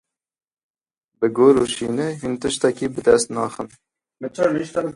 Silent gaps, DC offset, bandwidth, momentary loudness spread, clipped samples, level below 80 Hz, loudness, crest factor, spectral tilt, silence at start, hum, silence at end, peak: none; under 0.1%; 11.5 kHz; 15 LU; under 0.1%; -54 dBFS; -20 LUFS; 20 dB; -4.5 dB/octave; 1.2 s; none; 0.05 s; -2 dBFS